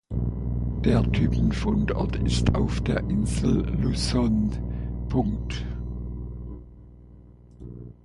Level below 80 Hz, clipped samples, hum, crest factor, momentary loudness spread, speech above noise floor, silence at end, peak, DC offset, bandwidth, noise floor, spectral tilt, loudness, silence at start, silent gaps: -32 dBFS; under 0.1%; 60 Hz at -30 dBFS; 18 dB; 15 LU; 25 dB; 0.1 s; -6 dBFS; under 0.1%; 11.5 kHz; -48 dBFS; -7 dB/octave; -26 LUFS; 0.1 s; none